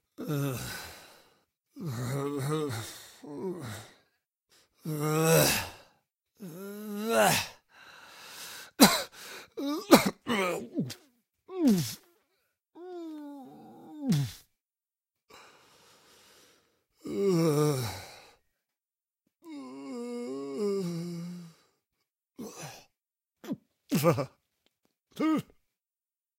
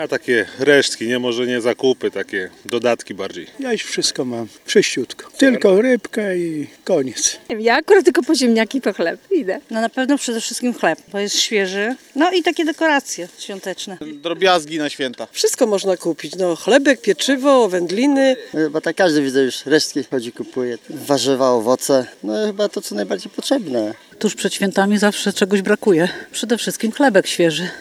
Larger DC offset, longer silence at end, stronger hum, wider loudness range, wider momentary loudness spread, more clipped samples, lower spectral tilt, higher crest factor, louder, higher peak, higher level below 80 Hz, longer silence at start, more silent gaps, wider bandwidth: neither; first, 0.95 s vs 0 s; neither; first, 11 LU vs 4 LU; first, 24 LU vs 11 LU; neither; about the same, -4.5 dB/octave vs -3.5 dB/octave; first, 30 dB vs 18 dB; second, -29 LUFS vs -18 LUFS; second, -4 dBFS vs 0 dBFS; about the same, -64 dBFS vs -68 dBFS; first, 0.2 s vs 0 s; neither; about the same, 16 kHz vs 15.5 kHz